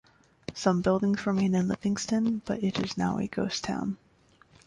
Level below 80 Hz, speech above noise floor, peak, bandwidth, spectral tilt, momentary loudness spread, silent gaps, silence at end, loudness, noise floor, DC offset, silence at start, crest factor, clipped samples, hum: -58 dBFS; 33 dB; -12 dBFS; 11 kHz; -6 dB/octave; 8 LU; none; 0.7 s; -28 LUFS; -61 dBFS; under 0.1%; 0.5 s; 18 dB; under 0.1%; none